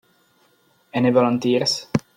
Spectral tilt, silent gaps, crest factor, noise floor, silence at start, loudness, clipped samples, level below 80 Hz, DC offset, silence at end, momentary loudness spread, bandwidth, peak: -5 dB/octave; none; 18 dB; -60 dBFS; 0.95 s; -20 LUFS; under 0.1%; -58 dBFS; under 0.1%; 0.15 s; 6 LU; 15 kHz; -4 dBFS